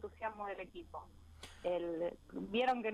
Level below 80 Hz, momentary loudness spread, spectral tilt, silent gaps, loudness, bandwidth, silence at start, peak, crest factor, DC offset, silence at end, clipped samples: -64 dBFS; 19 LU; -5.5 dB/octave; none; -40 LUFS; 13 kHz; 0 s; -24 dBFS; 18 dB; under 0.1%; 0 s; under 0.1%